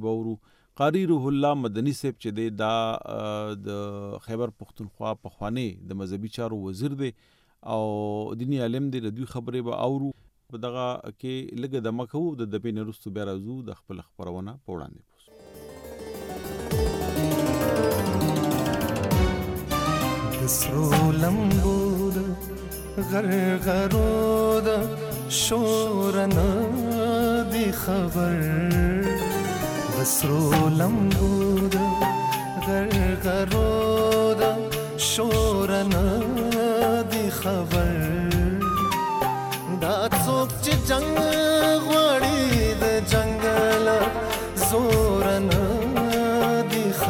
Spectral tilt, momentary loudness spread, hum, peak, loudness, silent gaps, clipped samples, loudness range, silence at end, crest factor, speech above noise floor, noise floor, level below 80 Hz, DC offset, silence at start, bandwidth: -5 dB/octave; 13 LU; none; -10 dBFS; -24 LUFS; none; under 0.1%; 11 LU; 0 s; 14 dB; 25 dB; -49 dBFS; -36 dBFS; under 0.1%; 0 s; 17 kHz